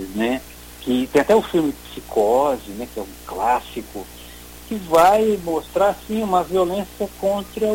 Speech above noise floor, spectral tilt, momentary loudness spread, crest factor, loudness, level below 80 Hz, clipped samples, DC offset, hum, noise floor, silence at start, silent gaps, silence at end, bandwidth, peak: 20 dB; -5 dB/octave; 18 LU; 18 dB; -20 LUFS; -44 dBFS; under 0.1%; under 0.1%; none; -39 dBFS; 0 s; none; 0 s; 17 kHz; -4 dBFS